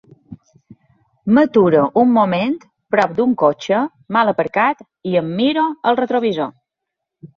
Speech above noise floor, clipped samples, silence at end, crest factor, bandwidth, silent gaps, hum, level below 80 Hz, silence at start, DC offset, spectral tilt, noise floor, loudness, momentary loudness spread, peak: 65 dB; under 0.1%; 0.1 s; 16 dB; 7.2 kHz; none; none; -60 dBFS; 0.3 s; under 0.1%; -7 dB/octave; -80 dBFS; -17 LUFS; 8 LU; -2 dBFS